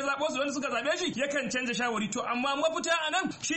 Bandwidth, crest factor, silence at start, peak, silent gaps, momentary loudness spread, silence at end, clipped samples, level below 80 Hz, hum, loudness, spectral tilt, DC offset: 8.8 kHz; 14 dB; 0 s; -16 dBFS; none; 3 LU; 0 s; under 0.1%; -68 dBFS; none; -29 LUFS; -2.5 dB/octave; under 0.1%